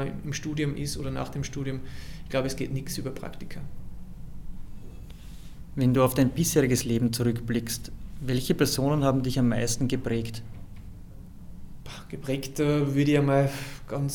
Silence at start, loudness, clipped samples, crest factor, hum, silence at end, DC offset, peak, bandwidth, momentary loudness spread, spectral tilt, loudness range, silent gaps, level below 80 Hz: 0 s; -27 LUFS; under 0.1%; 20 dB; none; 0 s; under 0.1%; -8 dBFS; 19 kHz; 23 LU; -5.5 dB/octave; 9 LU; none; -42 dBFS